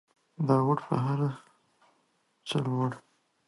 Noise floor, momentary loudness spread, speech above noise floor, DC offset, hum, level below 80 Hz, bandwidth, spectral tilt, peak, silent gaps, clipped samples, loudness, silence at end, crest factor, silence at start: -72 dBFS; 18 LU; 44 dB; under 0.1%; none; -70 dBFS; 11.5 kHz; -7.5 dB/octave; -12 dBFS; none; under 0.1%; -29 LUFS; 0.5 s; 20 dB; 0.4 s